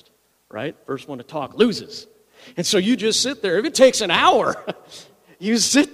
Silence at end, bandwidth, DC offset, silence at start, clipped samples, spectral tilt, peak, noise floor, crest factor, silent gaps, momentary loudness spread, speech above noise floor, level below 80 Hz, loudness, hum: 0.05 s; 15.5 kHz; under 0.1%; 0.55 s; under 0.1%; -3 dB/octave; 0 dBFS; -59 dBFS; 20 dB; none; 18 LU; 39 dB; -60 dBFS; -18 LUFS; none